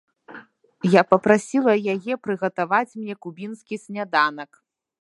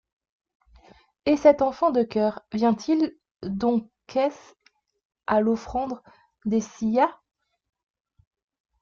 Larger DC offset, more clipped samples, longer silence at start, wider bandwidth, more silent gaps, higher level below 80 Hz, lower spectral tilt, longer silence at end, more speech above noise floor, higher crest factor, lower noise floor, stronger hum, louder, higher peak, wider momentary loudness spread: neither; neither; second, 0.3 s vs 1.25 s; first, 11.5 kHz vs 7.2 kHz; second, none vs 3.31-3.35 s, 5.05-5.10 s; second, -70 dBFS vs -58 dBFS; about the same, -6 dB/octave vs -6.5 dB/octave; second, 0.6 s vs 1.7 s; second, 24 dB vs 32 dB; about the same, 22 dB vs 20 dB; second, -46 dBFS vs -55 dBFS; neither; first, -21 LUFS vs -24 LUFS; first, 0 dBFS vs -4 dBFS; first, 17 LU vs 13 LU